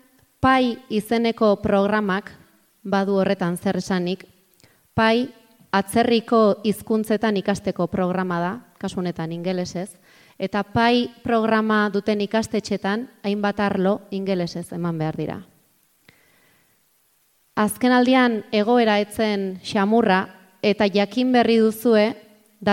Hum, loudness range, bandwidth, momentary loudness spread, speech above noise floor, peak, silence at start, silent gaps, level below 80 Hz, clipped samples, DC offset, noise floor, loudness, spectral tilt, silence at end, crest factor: none; 6 LU; 16 kHz; 10 LU; 43 dB; -4 dBFS; 0.4 s; none; -56 dBFS; under 0.1%; under 0.1%; -63 dBFS; -21 LUFS; -6 dB/octave; 0 s; 16 dB